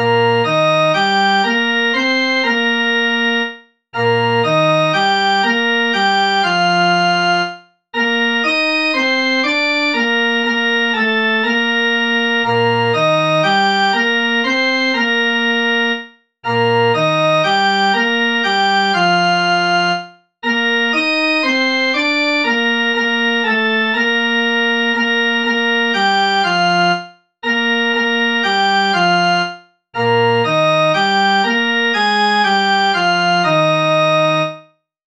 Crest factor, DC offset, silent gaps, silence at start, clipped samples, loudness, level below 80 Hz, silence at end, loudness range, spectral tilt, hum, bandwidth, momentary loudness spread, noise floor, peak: 14 dB; 0.2%; none; 0 s; under 0.1%; -14 LUFS; -68 dBFS; 0.45 s; 1 LU; -4.5 dB/octave; none; 10 kHz; 3 LU; -45 dBFS; 0 dBFS